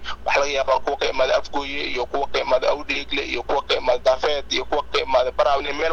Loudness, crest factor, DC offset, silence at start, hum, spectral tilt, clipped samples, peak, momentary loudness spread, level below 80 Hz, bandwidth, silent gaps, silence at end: -22 LUFS; 16 dB; under 0.1%; 0 s; none; -3 dB/octave; under 0.1%; -4 dBFS; 5 LU; -42 dBFS; 8.2 kHz; none; 0 s